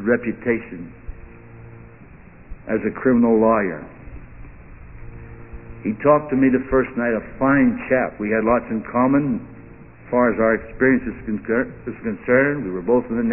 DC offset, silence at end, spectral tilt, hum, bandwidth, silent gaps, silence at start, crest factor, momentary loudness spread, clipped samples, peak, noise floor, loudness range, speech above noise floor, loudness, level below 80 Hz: 0.3%; 0 s; -12.5 dB/octave; none; 3 kHz; none; 0 s; 16 dB; 23 LU; under 0.1%; -4 dBFS; -44 dBFS; 3 LU; 25 dB; -20 LUFS; -42 dBFS